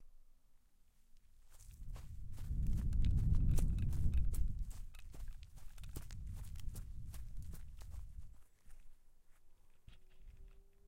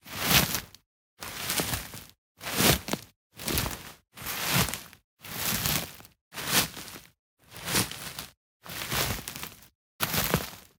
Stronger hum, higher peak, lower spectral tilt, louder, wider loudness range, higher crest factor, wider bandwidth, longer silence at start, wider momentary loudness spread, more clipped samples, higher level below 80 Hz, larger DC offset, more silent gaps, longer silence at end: neither; second, -22 dBFS vs -6 dBFS; first, -7 dB/octave vs -2.5 dB/octave; second, -43 LUFS vs -28 LUFS; first, 17 LU vs 3 LU; second, 18 dB vs 26 dB; second, 16 kHz vs 19 kHz; about the same, 0 s vs 0.05 s; first, 22 LU vs 19 LU; neither; first, -42 dBFS vs -48 dBFS; neither; second, none vs 0.86-1.17 s, 2.18-2.35 s, 3.16-3.30 s, 5.04-5.17 s, 6.21-6.31 s, 7.19-7.37 s, 8.37-8.60 s, 9.75-9.99 s; about the same, 0.25 s vs 0.15 s